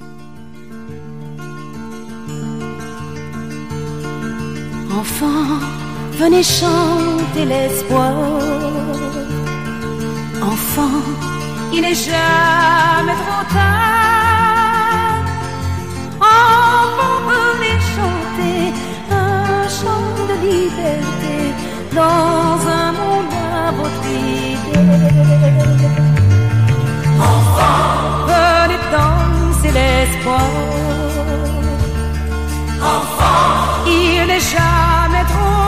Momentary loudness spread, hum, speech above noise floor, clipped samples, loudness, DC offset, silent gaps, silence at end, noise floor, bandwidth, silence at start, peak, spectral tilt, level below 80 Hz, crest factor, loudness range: 13 LU; none; 23 dB; under 0.1%; -14 LUFS; 2%; none; 0 s; -36 dBFS; 15.5 kHz; 0 s; -2 dBFS; -5.5 dB/octave; -26 dBFS; 12 dB; 8 LU